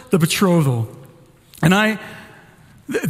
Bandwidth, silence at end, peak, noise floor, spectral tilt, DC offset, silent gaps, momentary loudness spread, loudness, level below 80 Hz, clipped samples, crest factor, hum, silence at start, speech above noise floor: 16 kHz; 0 s; -2 dBFS; -47 dBFS; -5.5 dB/octave; under 0.1%; none; 16 LU; -17 LUFS; -52 dBFS; under 0.1%; 18 dB; none; 0.1 s; 31 dB